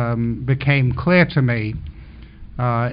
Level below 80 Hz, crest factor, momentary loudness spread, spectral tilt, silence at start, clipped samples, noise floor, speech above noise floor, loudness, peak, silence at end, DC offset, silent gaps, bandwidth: -38 dBFS; 16 dB; 17 LU; -6 dB/octave; 0 s; under 0.1%; -39 dBFS; 21 dB; -18 LUFS; -2 dBFS; 0 s; under 0.1%; none; 5.2 kHz